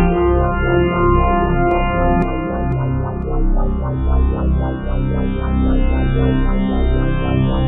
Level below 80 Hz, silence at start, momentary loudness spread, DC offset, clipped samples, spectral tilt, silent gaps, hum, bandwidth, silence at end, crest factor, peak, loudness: -18 dBFS; 0 s; 6 LU; under 0.1%; under 0.1%; -11 dB/octave; none; none; 3.9 kHz; 0 s; 12 dB; -2 dBFS; -18 LUFS